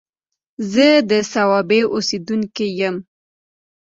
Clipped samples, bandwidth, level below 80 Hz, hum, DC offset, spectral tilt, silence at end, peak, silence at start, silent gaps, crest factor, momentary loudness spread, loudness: under 0.1%; 7.8 kHz; -62 dBFS; none; under 0.1%; -4.5 dB/octave; 0.85 s; -2 dBFS; 0.6 s; none; 16 dB; 10 LU; -17 LUFS